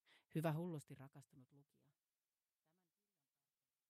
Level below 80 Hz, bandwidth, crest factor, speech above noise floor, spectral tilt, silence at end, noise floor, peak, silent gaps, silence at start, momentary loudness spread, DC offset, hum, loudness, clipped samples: under -90 dBFS; 15 kHz; 22 dB; over 41 dB; -7.5 dB/octave; 2.3 s; under -90 dBFS; -30 dBFS; none; 0.35 s; 19 LU; under 0.1%; none; -47 LUFS; under 0.1%